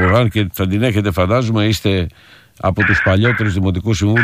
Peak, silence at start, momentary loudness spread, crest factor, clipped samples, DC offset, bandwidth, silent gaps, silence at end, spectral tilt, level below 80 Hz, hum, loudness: -2 dBFS; 0 s; 6 LU; 12 dB; under 0.1%; under 0.1%; 16 kHz; none; 0 s; -6.5 dB/octave; -36 dBFS; none; -15 LUFS